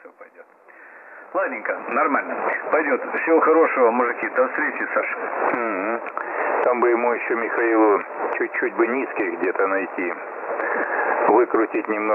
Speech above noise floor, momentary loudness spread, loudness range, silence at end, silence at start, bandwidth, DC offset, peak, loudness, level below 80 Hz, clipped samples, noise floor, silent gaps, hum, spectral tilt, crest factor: 27 dB; 9 LU; 3 LU; 0 s; 0.05 s; 3.3 kHz; under 0.1%; -6 dBFS; -21 LUFS; -84 dBFS; under 0.1%; -48 dBFS; none; none; -8.5 dB/octave; 16 dB